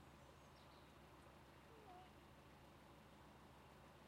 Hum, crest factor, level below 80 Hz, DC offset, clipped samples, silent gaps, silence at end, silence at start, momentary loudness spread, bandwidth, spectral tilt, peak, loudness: none; 14 dB; -74 dBFS; under 0.1%; under 0.1%; none; 0 s; 0 s; 2 LU; 15.5 kHz; -5 dB/octave; -52 dBFS; -65 LUFS